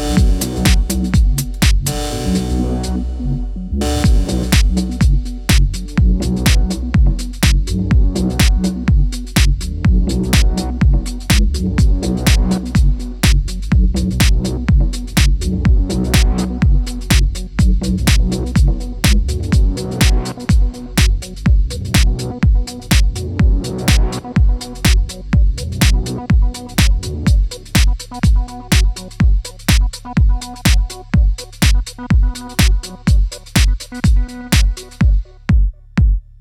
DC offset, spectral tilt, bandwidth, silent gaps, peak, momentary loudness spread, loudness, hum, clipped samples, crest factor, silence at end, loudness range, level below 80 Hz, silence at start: under 0.1%; -5 dB/octave; 16.5 kHz; none; 0 dBFS; 4 LU; -16 LUFS; none; under 0.1%; 14 dB; 0.2 s; 1 LU; -16 dBFS; 0 s